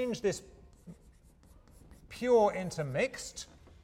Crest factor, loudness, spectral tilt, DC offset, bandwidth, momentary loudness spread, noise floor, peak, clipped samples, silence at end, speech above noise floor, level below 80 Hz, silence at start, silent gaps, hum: 18 dB; -32 LUFS; -5 dB/octave; under 0.1%; 15.5 kHz; 23 LU; -60 dBFS; -16 dBFS; under 0.1%; 0.4 s; 29 dB; -60 dBFS; 0 s; none; none